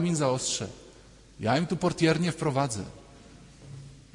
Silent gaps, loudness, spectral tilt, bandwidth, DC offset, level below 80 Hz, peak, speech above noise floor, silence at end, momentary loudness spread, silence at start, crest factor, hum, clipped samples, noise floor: none; -28 LUFS; -5 dB/octave; 11 kHz; under 0.1%; -56 dBFS; -10 dBFS; 26 dB; 0.15 s; 22 LU; 0 s; 18 dB; none; under 0.1%; -53 dBFS